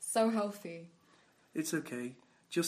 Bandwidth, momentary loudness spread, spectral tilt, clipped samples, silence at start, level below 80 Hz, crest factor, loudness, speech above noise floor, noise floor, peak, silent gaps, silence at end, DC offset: 15.5 kHz; 16 LU; -4 dB/octave; under 0.1%; 0 s; -86 dBFS; 20 dB; -37 LUFS; 32 dB; -67 dBFS; -18 dBFS; none; 0 s; under 0.1%